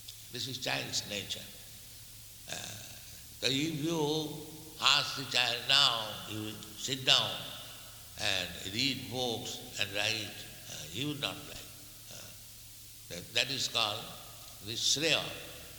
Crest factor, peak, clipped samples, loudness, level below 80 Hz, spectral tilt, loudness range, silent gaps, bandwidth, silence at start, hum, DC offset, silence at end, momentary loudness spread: 28 dB; -8 dBFS; under 0.1%; -31 LUFS; -62 dBFS; -2 dB/octave; 9 LU; none; 19.5 kHz; 0 s; none; under 0.1%; 0 s; 21 LU